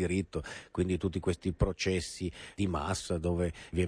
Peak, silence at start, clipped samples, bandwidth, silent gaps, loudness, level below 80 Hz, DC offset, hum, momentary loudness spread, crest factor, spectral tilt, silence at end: -14 dBFS; 0 s; under 0.1%; 11 kHz; none; -34 LUFS; -44 dBFS; under 0.1%; none; 8 LU; 18 dB; -5.5 dB/octave; 0 s